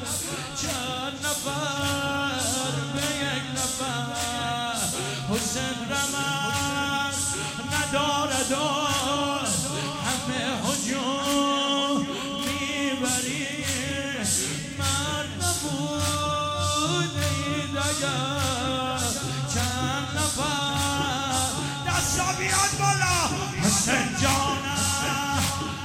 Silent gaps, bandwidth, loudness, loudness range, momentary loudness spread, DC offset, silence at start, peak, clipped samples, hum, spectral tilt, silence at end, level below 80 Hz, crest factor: none; 16.5 kHz; -25 LUFS; 3 LU; 5 LU; under 0.1%; 0 s; -8 dBFS; under 0.1%; none; -3 dB/octave; 0 s; -50 dBFS; 18 dB